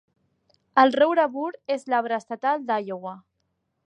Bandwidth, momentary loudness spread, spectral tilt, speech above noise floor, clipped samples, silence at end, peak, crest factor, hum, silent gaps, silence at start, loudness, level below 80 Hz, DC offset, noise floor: 9.6 kHz; 14 LU; -5 dB/octave; 52 dB; under 0.1%; 0.7 s; -4 dBFS; 20 dB; none; none; 0.75 s; -23 LUFS; -78 dBFS; under 0.1%; -75 dBFS